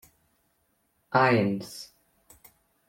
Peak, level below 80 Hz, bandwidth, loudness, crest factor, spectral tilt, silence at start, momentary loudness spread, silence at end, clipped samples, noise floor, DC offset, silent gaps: -10 dBFS; -68 dBFS; 16.5 kHz; -25 LUFS; 20 dB; -6 dB/octave; 1.1 s; 21 LU; 1.05 s; under 0.1%; -72 dBFS; under 0.1%; none